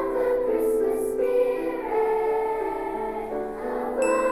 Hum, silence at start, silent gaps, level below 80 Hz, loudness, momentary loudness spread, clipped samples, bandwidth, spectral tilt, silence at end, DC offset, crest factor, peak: none; 0 s; none; -50 dBFS; -25 LUFS; 7 LU; under 0.1%; 15 kHz; -5 dB/octave; 0 s; 0.2%; 12 dB; -12 dBFS